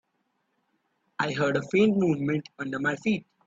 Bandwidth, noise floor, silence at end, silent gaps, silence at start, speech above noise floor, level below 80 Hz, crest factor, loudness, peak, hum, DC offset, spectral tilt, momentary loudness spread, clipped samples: 7.8 kHz; -75 dBFS; 0.25 s; none; 1.2 s; 49 dB; -66 dBFS; 16 dB; -26 LUFS; -12 dBFS; none; under 0.1%; -6.5 dB/octave; 9 LU; under 0.1%